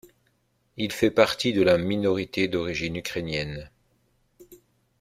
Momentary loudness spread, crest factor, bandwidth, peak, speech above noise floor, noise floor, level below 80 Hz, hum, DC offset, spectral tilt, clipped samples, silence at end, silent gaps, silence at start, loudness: 11 LU; 24 dB; 16 kHz; -2 dBFS; 45 dB; -69 dBFS; -54 dBFS; none; under 0.1%; -5 dB/octave; under 0.1%; 0.45 s; none; 0.75 s; -25 LUFS